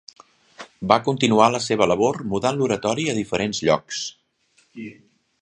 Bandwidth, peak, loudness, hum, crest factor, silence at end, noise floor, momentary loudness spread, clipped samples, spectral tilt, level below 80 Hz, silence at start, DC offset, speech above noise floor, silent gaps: 10.5 kHz; 0 dBFS; -21 LUFS; none; 22 dB; 0.5 s; -63 dBFS; 16 LU; under 0.1%; -4.5 dB/octave; -56 dBFS; 0.6 s; under 0.1%; 42 dB; none